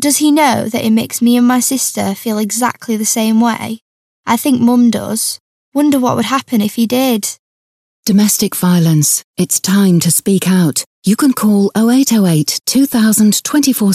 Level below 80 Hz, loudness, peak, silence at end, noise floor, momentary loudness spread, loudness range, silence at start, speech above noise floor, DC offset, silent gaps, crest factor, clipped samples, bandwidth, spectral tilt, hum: -58 dBFS; -12 LUFS; 0 dBFS; 0 s; under -90 dBFS; 7 LU; 3 LU; 0 s; over 78 dB; under 0.1%; 3.82-4.23 s, 5.40-5.72 s, 7.39-8.03 s, 9.24-9.34 s, 10.86-11.02 s; 12 dB; under 0.1%; 15.5 kHz; -4.5 dB/octave; none